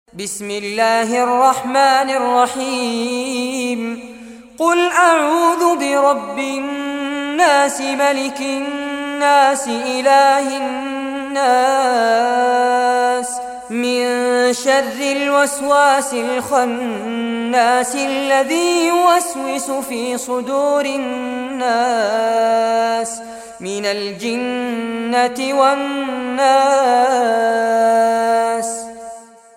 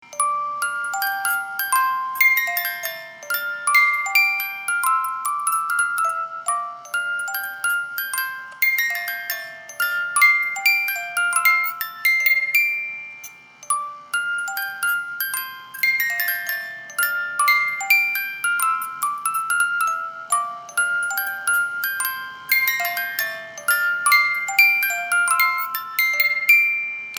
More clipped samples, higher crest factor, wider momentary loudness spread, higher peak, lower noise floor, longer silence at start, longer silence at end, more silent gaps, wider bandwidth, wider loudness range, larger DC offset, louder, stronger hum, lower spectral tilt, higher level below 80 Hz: neither; second, 14 dB vs 20 dB; about the same, 10 LU vs 11 LU; about the same, -2 dBFS vs -2 dBFS; second, -36 dBFS vs -42 dBFS; about the same, 0.15 s vs 0.05 s; first, 0.35 s vs 0 s; neither; second, 16.5 kHz vs over 20 kHz; about the same, 3 LU vs 5 LU; neither; first, -16 LUFS vs -20 LUFS; neither; first, -2 dB/octave vs 2.5 dB/octave; first, -60 dBFS vs -78 dBFS